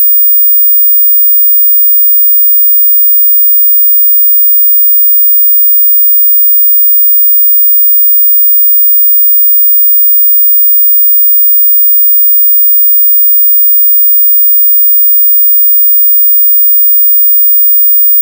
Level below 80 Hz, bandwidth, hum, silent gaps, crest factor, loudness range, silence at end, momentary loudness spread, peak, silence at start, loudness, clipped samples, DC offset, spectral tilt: under -90 dBFS; 16 kHz; none; none; 4 dB; 0 LU; 0 s; 0 LU; -2 dBFS; 0 s; -1 LUFS; under 0.1%; under 0.1%; 2 dB/octave